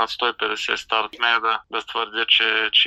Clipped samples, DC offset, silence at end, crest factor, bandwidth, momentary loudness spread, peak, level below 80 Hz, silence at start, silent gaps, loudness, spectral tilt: under 0.1%; under 0.1%; 0 s; 18 dB; 12.5 kHz; 9 LU; -4 dBFS; -62 dBFS; 0 s; none; -20 LUFS; 0 dB/octave